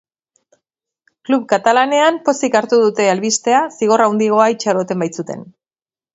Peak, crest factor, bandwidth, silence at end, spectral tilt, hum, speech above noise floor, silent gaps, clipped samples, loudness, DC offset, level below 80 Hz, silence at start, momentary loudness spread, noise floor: 0 dBFS; 16 dB; 8 kHz; 0.7 s; -4 dB/octave; none; over 75 dB; none; under 0.1%; -15 LUFS; under 0.1%; -66 dBFS; 1.3 s; 9 LU; under -90 dBFS